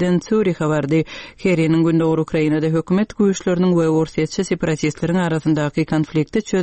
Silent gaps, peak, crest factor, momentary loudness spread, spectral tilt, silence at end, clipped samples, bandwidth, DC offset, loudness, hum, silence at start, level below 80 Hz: none; -6 dBFS; 12 dB; 5 LU; -7 dB/octave; 0 s; under 0.1%; 8.8 kHz; 0.2%; -18 LUFS; none; 0 s; -48 dBFS